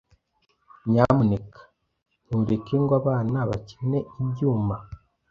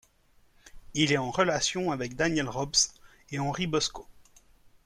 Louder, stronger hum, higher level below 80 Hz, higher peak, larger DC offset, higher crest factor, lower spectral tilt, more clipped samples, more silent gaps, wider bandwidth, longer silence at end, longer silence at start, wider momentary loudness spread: first, -24 LUFS vs -28 LUFS; neither; about the same, -50 dBFS vs -54 dBFS; first, -2 dBFS vs -10 dBFS; neither; about the same, 22 dB vs 20 dB; first, -10 dB/octave vs -3 dB/octave; neither; first, 2.02-2.06 s vs none; second, 7 kHz vs 14 kHz; second, 0.35 s vs 0.65 s; first, 0.85 s vs 0.65 s; about the same, 10 LU vs 8 LU